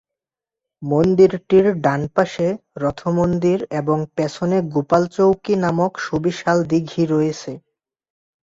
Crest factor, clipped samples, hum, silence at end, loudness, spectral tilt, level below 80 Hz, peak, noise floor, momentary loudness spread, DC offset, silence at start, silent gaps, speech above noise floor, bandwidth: 16 dB; under 0.1%; none; 0.85 s; -19 LUFS; -7 dB/octave; -52 dBFS; -2 dBFS; -88 dBFS; 8 LU; under 0.1%; 0.8 s; none; 70 dB; 7.8 kHz